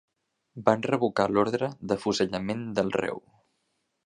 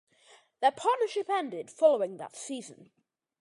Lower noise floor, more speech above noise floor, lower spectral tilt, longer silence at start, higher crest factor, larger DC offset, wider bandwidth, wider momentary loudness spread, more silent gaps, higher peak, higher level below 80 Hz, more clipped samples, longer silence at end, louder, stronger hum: first, -76 dBFS vs -61 dBFS; first, 50 dB vs 32 dB; first, -5.5 dB/octave vs -3 dB/octave; about the same, 0.55 s vs 0.6 s; about the same, 24 dB vs 20 dB; neither; about the same, 10.5 kHz vs 11.5 kHz; second, 6 LU vs 15 LU; neither; first, -4 dBFS vs -12 dBFS; first, -62 dBFS vs -88 dBFS; neither; first, 0.85 s vs 0.55 s; about the same, -27 LUFS vs -29 LUFS; neither